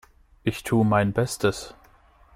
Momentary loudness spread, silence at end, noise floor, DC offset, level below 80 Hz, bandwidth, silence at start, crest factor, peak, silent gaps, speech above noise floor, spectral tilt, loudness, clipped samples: 13 LU; 0.65 s; -55 dBFS; under 0.1%; -50 dBFS; 16 kHz; 0.45 s; 18 dB; -8 dBFS; none; 32 dB; -6 dB/octave; -24 LUFS; under 0.1%